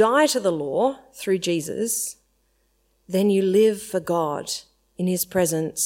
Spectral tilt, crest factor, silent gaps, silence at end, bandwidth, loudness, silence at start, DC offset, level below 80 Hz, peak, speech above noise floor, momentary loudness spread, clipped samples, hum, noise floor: -4 dB/octave; 16 dB; none; 0 s; 16.5 kHz; -23 LUFS; 0 s; under 0.1%; -62 dBFS; -6 dBFS; 44 dB; 10 LU; under 0.1%; none; -66 dBFS